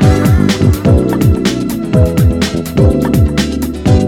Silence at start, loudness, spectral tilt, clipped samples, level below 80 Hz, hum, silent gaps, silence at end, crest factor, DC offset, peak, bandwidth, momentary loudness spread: 0 s; -12 LUFS; -7 dB/octave; 0.2%; -20 dBFS; none; none; 0 s; 10 dB; under 0.1%; 0 dBFS; 17 kHz; 5 LU